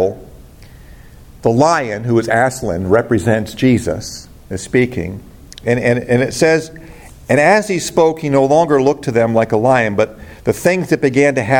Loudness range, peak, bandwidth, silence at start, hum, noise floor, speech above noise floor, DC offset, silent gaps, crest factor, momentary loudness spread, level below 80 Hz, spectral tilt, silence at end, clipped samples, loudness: 4 LU; 0 dBFS; 17 kHz; 0 s; none; -38 dBFS; 24 dB; under 0.1%; none; 14 dB; 13 LU; -42 dBFS; -6 dB/octave; 0 s; under 0.1%; -15 LUFS